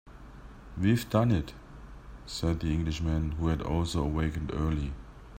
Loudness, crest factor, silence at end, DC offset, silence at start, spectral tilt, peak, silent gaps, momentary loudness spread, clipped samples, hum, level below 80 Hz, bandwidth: -30 LUFS; 20 dB; 0 s; under 0.1%; 0.05 s; -7 dB/octave; -10 dBFS; none; 23 LU; under 0.1%; none; -40 dBFS; 16 kHz